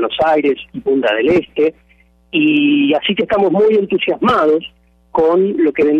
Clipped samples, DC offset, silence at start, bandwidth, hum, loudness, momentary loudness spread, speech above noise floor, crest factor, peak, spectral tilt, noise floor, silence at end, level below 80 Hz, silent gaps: under 0.1%; under 0.1%; 0 s; 6.2 kHz; none; -14 LUFS; 6 LU; 38 dB; 10 dB; -4 dBFS; -7 dB/octave; -51 dBFS; 0 s; -50 dBFS; none